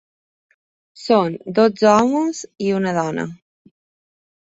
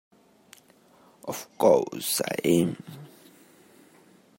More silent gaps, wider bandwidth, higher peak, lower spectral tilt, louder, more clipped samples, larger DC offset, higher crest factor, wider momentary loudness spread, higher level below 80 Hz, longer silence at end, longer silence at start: neither; second, 8 kHz vs 16.5 kHz; first, -2 dBFS vs -6 dBFS; about the same, -5.5 dB/octave vs -4.5 dB/octave; first, -18 LUFS vs -25 LUFS; neither; neither; about the same, 18 dB vs 22 dB; second, 12 LU vs 20 LU; first, -62 dBFS vs -68 dBFS; second, 1.05 s vs 1.35 s; second, 0.95 s vs 1.25 s